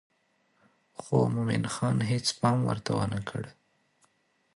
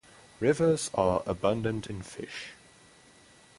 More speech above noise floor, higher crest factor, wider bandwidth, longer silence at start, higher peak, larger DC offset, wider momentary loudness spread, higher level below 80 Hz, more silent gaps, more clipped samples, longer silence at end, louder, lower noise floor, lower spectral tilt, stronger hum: first, 43 dB vs 29 dB; about the same, 20 dB vs 22 dB; about the same, 11.5 kHz vs 11.5 kHz; first, 1 s vs 0.4 s; about the same, -12 dBFS vs -10 dBFS; neither; about the same, 14 LU vs 14 LU; second, -60 dBFS vs -54 dBFS; neither; neither; about the same, 1.05 s vs 1.05 s; about the same, -29 LUFS vs -29 LUFS; first, -71 dBFS vs -57 dBFS; about the same, -5.5 dB/octave vs -5.5 dB/octave; neither